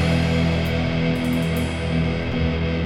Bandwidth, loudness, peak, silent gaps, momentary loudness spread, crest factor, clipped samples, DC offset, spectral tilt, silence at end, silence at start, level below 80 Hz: 15 kHz; -22 LUFS; -8 dBFS; none; 3 LU; 12 dB; under 0.1%; under 0.1%; -7 dB/octave; 0 s; 0 s; -32 dBFS